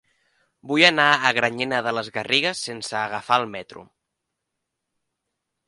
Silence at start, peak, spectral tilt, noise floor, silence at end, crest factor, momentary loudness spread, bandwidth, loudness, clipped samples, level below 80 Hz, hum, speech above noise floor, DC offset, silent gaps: 0.65 s; 0 dBFS; -3 dB/octave; -81 dBFS; 1.85 s; 24 dB; 12 LU; 11.5 kHz; -20 LUFS; under 0.1%; -68 dBFS; none; 59 dB; under 0.1%; none